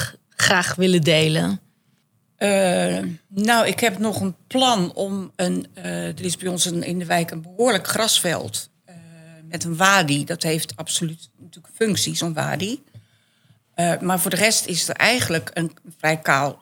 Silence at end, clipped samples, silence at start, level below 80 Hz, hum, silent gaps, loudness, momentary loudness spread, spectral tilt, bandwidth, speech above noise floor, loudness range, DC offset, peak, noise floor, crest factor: 0.05 s; under 0.1%; 0 s; -64 dBFS; none; none; -20 LUFS; 12 LU; -3.5 dB/octave; 18 kHz; 43 dB; 4 LU; under 0.1%; 0 dBFS; -64 dBFS; 22 dB